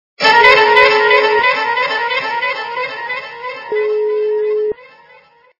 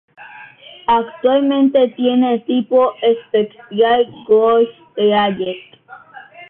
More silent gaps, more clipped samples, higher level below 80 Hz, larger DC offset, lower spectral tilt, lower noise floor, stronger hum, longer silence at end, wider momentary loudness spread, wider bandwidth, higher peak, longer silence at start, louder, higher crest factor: neither; first, 0.2% vs under 0.1%; about the same, -54 dBFS vs -58 dBFS; neither; second, -2.5 dB/octave vs -9.5 dB/octave; first, -47 dBFS vs -39 dBFS; neither; first, 0.75 s vs 0.05 s; first, 15 LU vs 10 LU; first, 6 kHz vs 4.1 kHz; first, 0 dBFS vs -4 dBFS; about the same, 0.2 s vs 0.2 s; about the same, -13 LUFS vs -15 LUFS; about the same, 14 dB vs 14 dB